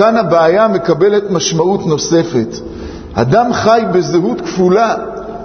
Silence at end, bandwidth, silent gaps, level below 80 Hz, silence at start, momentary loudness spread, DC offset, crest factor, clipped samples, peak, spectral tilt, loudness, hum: 0 s; 6.6 kHz; none; -40 dBFS; 0 s; 11 LU; under 0.1%; 12 dB; under 0.1%; 0 dBFS; -5.5 dB/octave; -12 LUFS; none